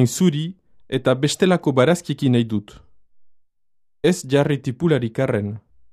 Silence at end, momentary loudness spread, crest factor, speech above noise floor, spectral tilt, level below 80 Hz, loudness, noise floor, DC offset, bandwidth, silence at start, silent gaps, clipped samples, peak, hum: 0.35 s; 10 LU; 18 dB; 52 dB; -6 dB/octave; -56 dBFS; -20 LUFS; -70 dBFS; under 0.1%; 14 kHz; 0 s; none; under 0.1%; -2 dBFS; none